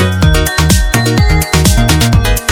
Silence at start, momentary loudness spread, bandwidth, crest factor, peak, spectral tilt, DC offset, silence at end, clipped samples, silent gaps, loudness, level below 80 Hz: 0 s; 2 LU; 18.5 kHz; 8 dB; 0 dBFS; -4.5 dB/octave; under 0.1%; 0 s; 0.5%; none; -10 LUFS; -14 dBFS